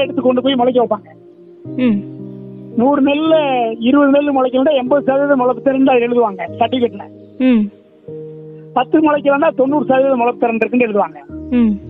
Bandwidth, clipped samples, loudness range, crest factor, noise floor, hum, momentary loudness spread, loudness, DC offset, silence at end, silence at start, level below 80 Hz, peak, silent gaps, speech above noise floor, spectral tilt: 4.1 kHz; under 0.1%; 4 LU; 14 dB; -39 dBFS; none; 18 LU; -14 LUFS; under 0.1%; 0 s; 0 s; -52 dBFS; 0 dBFS; none; 26 dB; -9.5 dB/octave